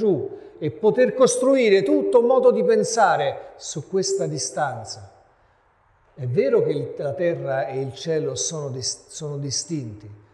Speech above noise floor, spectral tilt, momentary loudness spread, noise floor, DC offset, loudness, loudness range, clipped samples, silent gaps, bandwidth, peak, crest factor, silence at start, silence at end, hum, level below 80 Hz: 39 dB; -4.5 dB/octave; 15 LU; -60 dBFS; under 0.1%; -21 LUFS; 8 LU; under 0.1%; none; 12 kHz; -4 dBFS; 18 dB; 0 s; 0.2 s; none; -62 dBFS